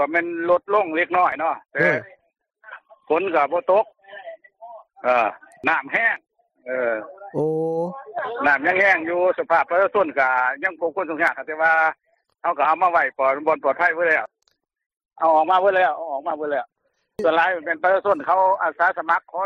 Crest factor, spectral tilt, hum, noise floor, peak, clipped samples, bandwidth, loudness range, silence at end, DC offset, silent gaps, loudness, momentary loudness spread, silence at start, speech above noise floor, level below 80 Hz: 16 dB; -6 dB/octave; none; -69 dBFS; -6 dBFS; under 0.1%; 7.8 kHz; 4 LU; 0 s; under 0.1%; 14.86-14.90 s; -20 LUFS; 10 LU; 0 s; 49 dB; -70 dBFS